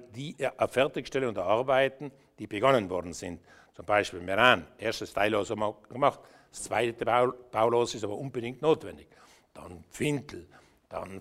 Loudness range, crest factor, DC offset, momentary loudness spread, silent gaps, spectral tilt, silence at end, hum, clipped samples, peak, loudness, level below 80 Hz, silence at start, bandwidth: 4 LU; 24 dB; under 0.1%; 20 LU; none; -4.5 dB/octave; 0 s; none; under 0.1%; -6 dBFS; -28 LUFS; -62 dBFS; 0 s; 15.5 kHz